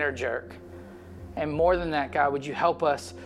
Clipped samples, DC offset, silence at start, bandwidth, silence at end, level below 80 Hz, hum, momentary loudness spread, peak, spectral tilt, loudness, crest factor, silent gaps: under 0.1%; under 0.1%; 0 s; 13 kHz; 0 s; -48 dBFS; none; 21 LU; -10 dBFS; -5.5 dB/octave; -27 LUFS; 18 dB; none